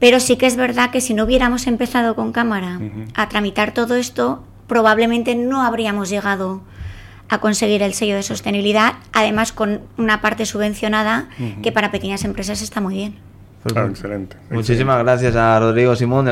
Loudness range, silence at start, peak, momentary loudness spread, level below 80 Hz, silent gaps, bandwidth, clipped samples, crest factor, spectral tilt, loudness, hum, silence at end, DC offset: 4 LU; 0 s; -2 dBFS; 11 LU; -40 dBFS; none; 16.5 kHz; under 0.1%; 16 dB; -4.5 dB/octave; -17 LUFS; none; 0 s; under 0.1%